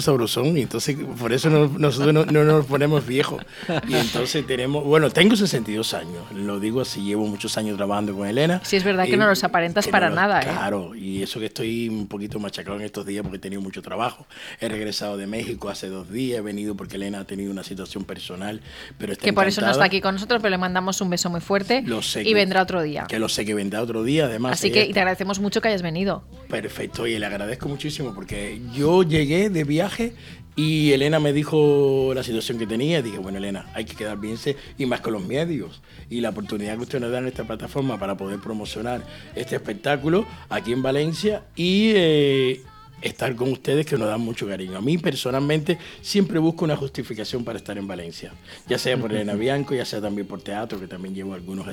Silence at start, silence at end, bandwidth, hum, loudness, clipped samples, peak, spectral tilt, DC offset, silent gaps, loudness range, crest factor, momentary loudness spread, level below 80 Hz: 0 s; 0 s; 17.5 kHz; none; -23 LUFS; under 0.1%; 0 dBFS; -5 dB/octave; under 0.1%; none; 9 LU; 22 dB; 13 LU; -50 dBFS